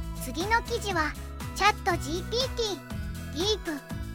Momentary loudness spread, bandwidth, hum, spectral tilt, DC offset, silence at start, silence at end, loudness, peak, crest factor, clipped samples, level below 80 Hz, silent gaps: 11 LU; 17 kHz; none; -4 dB/octave; under 0.1%; 0 s; 0 s; -29 LUFS; -8 dBFS; 22 dB; under 0.1%; -40 dBFS; none